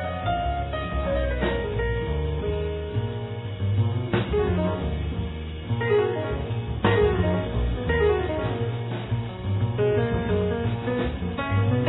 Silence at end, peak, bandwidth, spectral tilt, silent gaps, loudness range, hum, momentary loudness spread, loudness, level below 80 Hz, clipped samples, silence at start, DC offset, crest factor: 0 s; -8 dBFS; 4.1 kHz; -11 dB/octave; none; 3 LU; none; 7 LU; -26 LUFS; -34 dBFS; under 0.1%; 0 s; under 0.1%; 16 dB